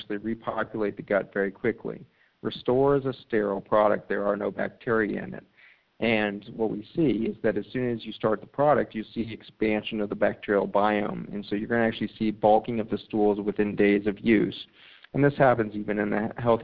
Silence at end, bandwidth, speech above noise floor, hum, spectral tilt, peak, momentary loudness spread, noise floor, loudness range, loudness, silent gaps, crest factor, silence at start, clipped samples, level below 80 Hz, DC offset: 0 s; 5 kHz; 29 dB; none; -10 dB/octave; -6 dBFS; 10 LU; -55 dBFS; 3 LU; -26 LUFS; none; 20 dB; 0 s; under 0.1%; -54 dBFS; under 0.1%